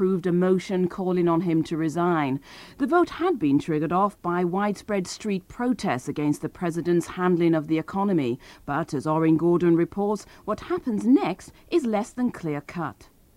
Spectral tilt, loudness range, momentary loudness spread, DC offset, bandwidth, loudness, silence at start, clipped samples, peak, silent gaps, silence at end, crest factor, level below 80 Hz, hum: -7 dB/octave; 3 LU; 9 LU; under 0.1%; 13 kHz; -25 LUFS; 0 s; under 0.1%; -8 dBFS; none; 0.35 s; 16 dB; -56 dBFS; none